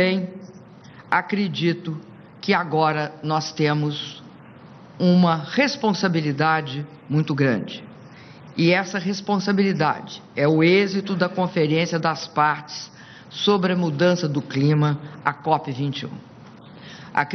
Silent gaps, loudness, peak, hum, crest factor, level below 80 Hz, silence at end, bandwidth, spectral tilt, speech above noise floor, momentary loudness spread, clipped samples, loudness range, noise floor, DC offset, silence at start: none; -22 LUFS; -4 dBFS; none; 18 dB; -64 dBFS; 0 s; 6.6 kHz; -6 dB/octave; 23 dB; 15 LU; under 0.1%; 3 LU; -44 dBFS; under 0.1%; 0 s